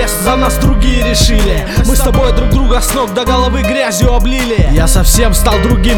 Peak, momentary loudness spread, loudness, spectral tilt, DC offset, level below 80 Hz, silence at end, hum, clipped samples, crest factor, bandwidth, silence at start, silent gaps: 0 dBFS; 3 LU; -11 LUFS; -4.5 dB/octave; under 0.1%; -12 dBFS; 0 s; none; 0.1%; 10 dB; 18.5 kHz; 0 s; none